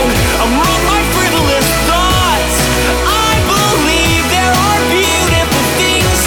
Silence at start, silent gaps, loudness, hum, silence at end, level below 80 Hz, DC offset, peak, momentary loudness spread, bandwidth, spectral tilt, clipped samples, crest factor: 0 s; none; -11 LUFS; none; 0 s; -22 dBFS; under 0.1%; -2 dBFS; 1 LU; over 20 kHz; -3.5 dB/octave; under 0.1%; 10 dB